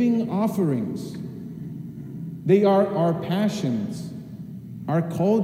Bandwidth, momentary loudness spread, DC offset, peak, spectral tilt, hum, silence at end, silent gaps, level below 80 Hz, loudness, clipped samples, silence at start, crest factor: 16 kHz; 17 LU; under 0.1%; -6 dBFS; -8 dB/octave; none; 0 s; none; -62 dBFS; -23 LUFS; under 0.1%; 0 s; 18 dB